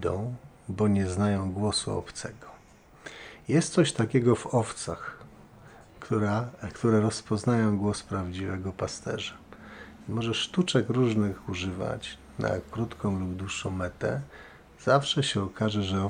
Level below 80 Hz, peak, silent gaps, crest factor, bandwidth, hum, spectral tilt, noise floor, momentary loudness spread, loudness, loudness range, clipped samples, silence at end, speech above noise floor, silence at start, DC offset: -56 dBFS; -8 dBFS; none; 20 dB; 10 kHz; none; -5.5 dB/octave; -54 dBFS; 17 LU; -28 LUFS; 3 LU; under 0.1%; 0 s; 27 dB; 0 s; under 0.1%